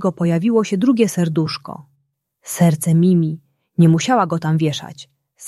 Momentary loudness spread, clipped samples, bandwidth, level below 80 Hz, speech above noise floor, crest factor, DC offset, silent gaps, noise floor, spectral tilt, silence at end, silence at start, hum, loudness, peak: 14 LU; under 0.1%; 13.5 kHz; -60 dBFS; 52 dB; 16 dB; under 0.1%; none; -68 dBFS; -6.5 dB/octave; 0 s; 0 s; none; -17 LUFS; -2 dBFS